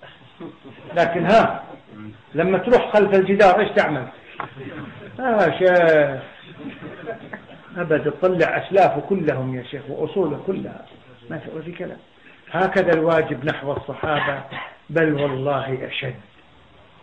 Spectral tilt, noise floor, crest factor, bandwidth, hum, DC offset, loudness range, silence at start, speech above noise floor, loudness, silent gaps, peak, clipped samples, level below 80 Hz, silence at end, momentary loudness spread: -7 dB/octave; -51 dBFS; 16 dB; 8.8 kHz; none; 0.1%; 6 LU; 0 s; 31 dB; -19 LUFS; none; -4 dBFS; under 0.1%; -52 dBFS; 0.8 s; 20 LU